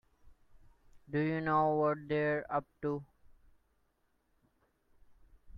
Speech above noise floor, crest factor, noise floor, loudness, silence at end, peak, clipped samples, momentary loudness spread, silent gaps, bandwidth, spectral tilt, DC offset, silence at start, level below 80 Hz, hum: 43 dB; 18 dB; -76 dBFS; -34 LUFS; 0 s; -20 dBFS; under 0.1%; 9 LU; none; 5.6 kHz; -9.5 dB/octave; under 0.1%; 0.25 s; -66 dBFS; none